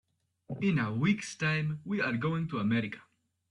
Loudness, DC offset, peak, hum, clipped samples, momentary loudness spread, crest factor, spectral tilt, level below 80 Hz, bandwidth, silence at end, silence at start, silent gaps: -31 LUFS; under 0.1%; -16 dBFS; none; under 0.1%; 7 LU; 16 dB; -6.5 dB/octave; -66 dBFS; 11 kHz; 0.5 s; 0.5 s; none